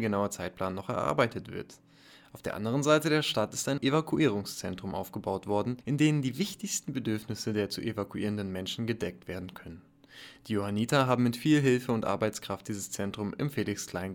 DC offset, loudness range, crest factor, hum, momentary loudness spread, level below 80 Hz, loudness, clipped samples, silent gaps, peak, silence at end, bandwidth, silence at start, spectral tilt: under 0.1%; 5 LU; 20 dB; none; 14 LU; -62 dBFS; -31 LUFS; under 0.1%; none; -12 dBFS; 0 s; 19 kHz; 0 s; -5 dB/octave